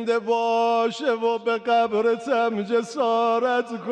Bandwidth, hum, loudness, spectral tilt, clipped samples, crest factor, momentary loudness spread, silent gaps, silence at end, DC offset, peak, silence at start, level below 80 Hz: 9.6 kHz; none; -22 LUFS; -4.5 dB/octave; under 0.1%; 10 dB; 3 LU; none; 0 s; under 0.1%; -12 dBFS; 0 s; -74 dBFS